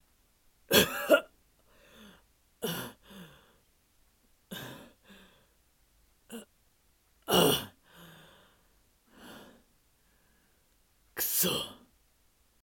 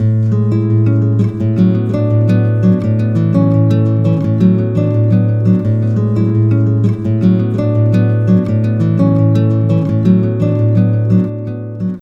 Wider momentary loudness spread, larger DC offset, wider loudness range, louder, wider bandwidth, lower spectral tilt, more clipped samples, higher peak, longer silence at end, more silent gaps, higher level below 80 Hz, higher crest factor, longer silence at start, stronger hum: first, 27 LU vs 3 LU; neither; first, 20 LU vs 1 LU; second, -28 LUFS vs -13 LUFS; first, 18 kHz vs 4.1 kHz; second, -3 dB/octave vs -11 dB/octave; neither; second, -8 dBFS vs 0 dBFS; first, 0.9 s vs 0 s; neither; second, -64 dBFS vs -42 dBFS; first, 28 dB vs 12 dB; first, 0.7 s vs 0 s; neither